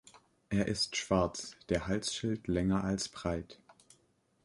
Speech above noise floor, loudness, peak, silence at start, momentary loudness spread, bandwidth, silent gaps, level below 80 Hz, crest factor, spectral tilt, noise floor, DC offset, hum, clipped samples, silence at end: 39 dB; -34 LUFS; -14 dBFS; 0.05 s; 7 LU; 11.5 kHz; none; -52 dBFS; 22 dB; -4.5 dB/octave; -72 dBFS; under 0.1%; none; under 0.1%; 0.75 s